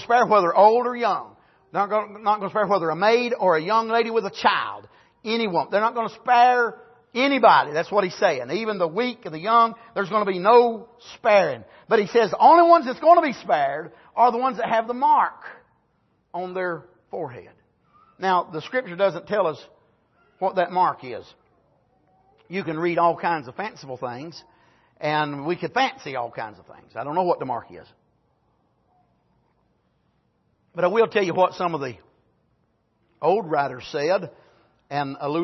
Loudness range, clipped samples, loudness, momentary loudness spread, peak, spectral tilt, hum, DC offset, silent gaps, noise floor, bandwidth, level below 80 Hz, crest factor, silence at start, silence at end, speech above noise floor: 10 LU; under 0.1%; -21 LUFS; 17 LU; -2 dBFS; -5.5 dB/octave; none; under 0.1%; none; -68 dBFS; 6.2 kHz; -70 dBFS; 20 dB; 0 s; 0 s; 46 dB